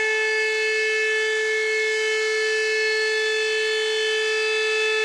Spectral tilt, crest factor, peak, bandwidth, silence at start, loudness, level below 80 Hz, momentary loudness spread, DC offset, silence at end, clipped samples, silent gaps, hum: 2 dB/octave; 12 dB; -10 dBFS; 12.5 kHz; 0 s; -21 LUFS; -74 dBFS; 1 LU; under 0.1%; 0 s; under 0.1%; none; none